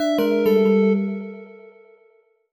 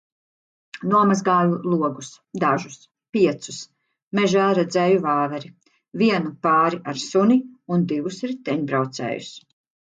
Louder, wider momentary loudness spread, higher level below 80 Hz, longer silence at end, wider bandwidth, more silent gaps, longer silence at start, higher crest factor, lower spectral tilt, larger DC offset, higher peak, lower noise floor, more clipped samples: about the same, -19 LUFS vs -21 LUFS; first, 18 LU vs 15 LU; about the same, -68 dBFS vs -68 dBFS; first, 0.95 s vs 0.4 s; first, 19 kHz vs 9.2 kHz; second, none vs 3.09-3.13 s, 4.02-4.11 s; second, 0 s vs 0.75 s; about the same, 14 dB vs 16 dB; first, -7.5 dB/octave vs -6 dB/octave; neither; about the same, -8 dBFS vs -6 dBFS; second, -59 dBFS vs under -90 dBFS; neither